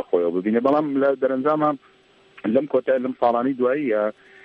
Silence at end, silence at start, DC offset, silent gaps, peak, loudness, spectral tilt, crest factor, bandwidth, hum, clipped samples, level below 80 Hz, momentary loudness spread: 0.35 s; 0 s; under 0.1%; none; -6 dBFS; -21 LUFS; -9 dB/octave; 16 dB; 5.2 kHz; none; under 0.1%; -70 dBFS; 4 LU